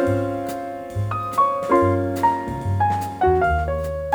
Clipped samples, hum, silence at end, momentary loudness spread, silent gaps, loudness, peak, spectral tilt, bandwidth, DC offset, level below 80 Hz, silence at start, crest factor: under 0.1%; none; 0 s; 9 LU; none; -21 LUFS; -6 dBFS; -7.5 dB/octave; over 20 kHz; under 0.1%; -36 dBFS; 0 s; 16 dB